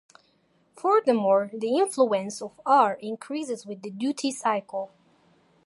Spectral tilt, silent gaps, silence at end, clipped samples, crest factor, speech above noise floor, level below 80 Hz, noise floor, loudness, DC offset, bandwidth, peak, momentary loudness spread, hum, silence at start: -4.5 dB/octave; none; 0.8 s; under 0.1%; 20 dB; 41 dB; -80 dBFS; -66 dBFS; -25 LUFS; under 0.1%; 11.5 kHz; -6 dBFS; 14 LU; none; 0.75 s